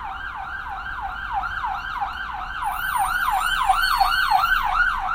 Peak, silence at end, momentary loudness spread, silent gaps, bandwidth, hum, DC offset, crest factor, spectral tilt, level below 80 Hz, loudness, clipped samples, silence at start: -6 dBFS; 0 s; 12 LU; none; 16 kHz; none; under 0.1%; 16 dB; -1 dB/octave; -38 dBFS; -22 LUFS; under 0.1%; 0 s